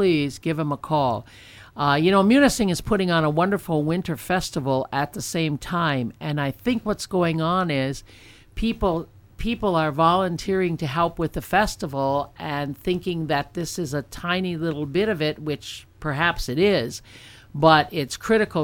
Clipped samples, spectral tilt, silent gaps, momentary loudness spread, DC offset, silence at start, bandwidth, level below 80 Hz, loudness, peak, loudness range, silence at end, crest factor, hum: under 0.1%; -5.5 dB/octave; none; 10 LU; under 0.1%; 0 s; 17 kHz; -42 dBFS; -23 LUFS; -2 dBFS; 5 LU; 0 s; 20 dB; none